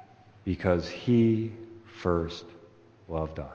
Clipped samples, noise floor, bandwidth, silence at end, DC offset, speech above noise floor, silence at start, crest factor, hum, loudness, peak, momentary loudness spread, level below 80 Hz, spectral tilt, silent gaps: under 0.1%; -55 dBFS; 7.2 kHz; 0 s; under 0.1%; 28 dB; 0.45 s; 20 dB; none; -29 LUFS; -10 dBFS; 17 LU; -50 dBFS; -8 dB/octave; none